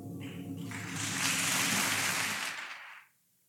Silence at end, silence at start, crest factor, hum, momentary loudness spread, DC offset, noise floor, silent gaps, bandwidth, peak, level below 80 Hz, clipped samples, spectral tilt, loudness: 0.45 s; 0 s; 20 dB; none; 15 LU; under 0.1%; -63 dBFS; none; 19 kHz; -16 dBFS; -76 dBFS; under 0.1%; -1.5 dB/octave; -31 LUFS